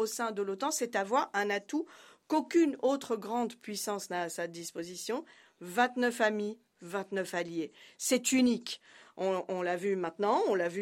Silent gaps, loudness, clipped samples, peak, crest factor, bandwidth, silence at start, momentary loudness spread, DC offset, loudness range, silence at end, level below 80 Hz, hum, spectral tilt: none; -32 LUFS; under 0.1%; -14 dBFS; 20 dB; 16 kHz; 0 s; 12 LU; under 0.1%; 3 LU; 0 s; -80 dBFS; none; -3.5 dB/octave